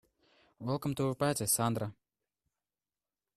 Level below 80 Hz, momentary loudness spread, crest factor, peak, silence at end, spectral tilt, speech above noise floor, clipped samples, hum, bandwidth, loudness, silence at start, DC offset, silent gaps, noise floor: -66 dBFS; 11 LU; 20 dB; -16 dBFS; 1.45 s; -4.5 dB/octave; over 57 dB; under 0.1%; none; 14 kHz; -33 LUFS; 0.6 s; under 0.1%; none; under -90 dBFS